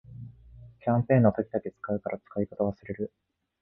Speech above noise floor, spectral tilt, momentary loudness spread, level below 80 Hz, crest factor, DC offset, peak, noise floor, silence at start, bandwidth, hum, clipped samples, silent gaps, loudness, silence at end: 23 dB; -13 dB/octave; 17 LU; -56 dBFS; 22 dB; under 0.1%; -8 dBFS; -51 dBFS; 0.1 s; 3.7 kHz; none; under 0.1%; none; -29 LUFS; 0.55 s